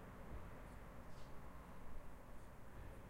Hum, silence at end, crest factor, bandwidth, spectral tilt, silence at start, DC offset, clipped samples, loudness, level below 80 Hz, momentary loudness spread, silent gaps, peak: none; 0 s; 14 dB; 16 kHz; -6.5 dB/octave; 0 s; under 0.1%; under 0.1%; -58 LUFS; -58 dBFS; 4 LU; none; -38 dBFS